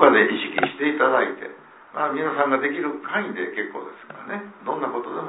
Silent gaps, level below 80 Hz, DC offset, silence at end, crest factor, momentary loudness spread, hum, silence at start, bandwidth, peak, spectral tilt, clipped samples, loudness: none; -70 dBFS; under 0.1%; 0 s; 22 dB; 16 LU; none; 0 s; 4.1 kHz; 0 dBFS; -8.5 dB/octave; under 0.1%; -23 LUFS